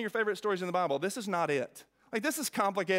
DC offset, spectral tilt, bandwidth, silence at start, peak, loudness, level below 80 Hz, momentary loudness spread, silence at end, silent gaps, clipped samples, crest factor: under 0.1%; -4 dB/octave; 16 kHz; 0 s; -14 dBFS; -32 LUFS; -80 dBFS; 4 LU; 0 s; none; under 0.1%; 18 dB